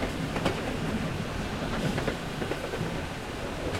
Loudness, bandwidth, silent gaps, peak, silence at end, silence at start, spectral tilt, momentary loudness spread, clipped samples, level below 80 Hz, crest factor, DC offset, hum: -32 LUFS; 16.5 kHz; none; -14 dBFS; 0 s; 0 s; -5.5 dB/octave; 5 LU; under 0.1%; -42 dBFS; 18 dB; under 0.1%; none